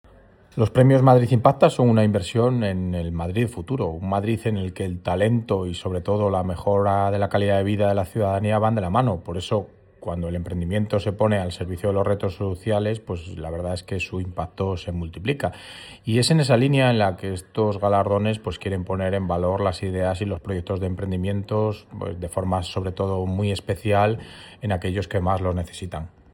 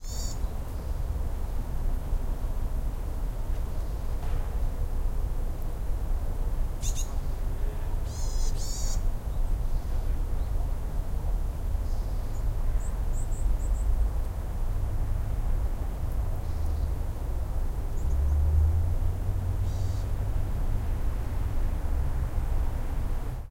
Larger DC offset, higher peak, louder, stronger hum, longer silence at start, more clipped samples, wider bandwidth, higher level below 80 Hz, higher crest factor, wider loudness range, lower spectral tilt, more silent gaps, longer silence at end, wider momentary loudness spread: neither; first, -2 dBFS vs -12 dBFS; first, -23 LUFS vs -33 LUFS; neither; first, 0.55 s vs 0 s; neither; about the same, 15.5 kHz vs 16 kHz; second, -50 dBFS vs -28 dBFS; first, 20 dB vs 14 dB; about the same, 5 LU vs 5 LU; about the same, -7 dB/octave vs -6 dB/octave; neither; first, 0.25 s vs 0 s; first, 12 LU vs 5 LU